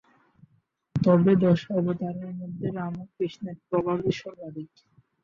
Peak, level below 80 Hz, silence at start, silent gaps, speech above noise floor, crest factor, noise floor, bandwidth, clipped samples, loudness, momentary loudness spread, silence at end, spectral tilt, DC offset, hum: -8 dBFS; -60 dBFS; 0.95 s; none; 43 dB; 20 dB; -69 dBFS; 7 kHz; under 0.1%; -26 LUFS; 19 LU; 0.55 s; -9 dB/octave; under 0.1%; none